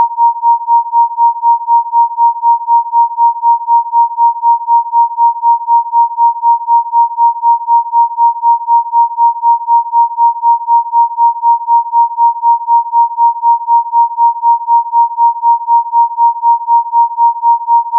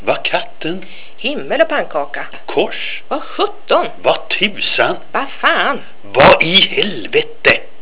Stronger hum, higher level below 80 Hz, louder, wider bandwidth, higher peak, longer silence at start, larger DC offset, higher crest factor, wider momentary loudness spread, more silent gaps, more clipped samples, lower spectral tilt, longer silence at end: neither; second, under -90 dBFS vs -44 dBFS; first, -10 LUFS vs -14 LUFS; second, 1.1 kHz vs 4 kHz; about the same, -2 dBFS vs 0 dBFS; about the same, 0 s vs 0.05 s; second, under 0.1% vs 7%; second, 8 dB vs 16 dB; second, 2 LU vs 14 LU; neither; second, under 0.1% vs 0.4%; second, 8 dB/octave vs -7.5 dB/octave; second, 0 s vs 0.15 s